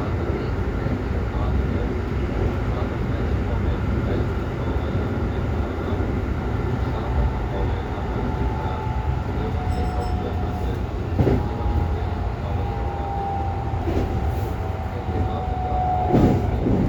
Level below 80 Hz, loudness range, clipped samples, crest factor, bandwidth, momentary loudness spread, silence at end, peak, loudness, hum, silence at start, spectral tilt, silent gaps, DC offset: -28 dBFS; 1 LU; under 0.1%; 18 dB; 18.5 kHz; 4 LU; 0 s; -6 dBFS; -24 LUFS; none; 0 s; -8.5 dB/octave; none; under 0.1%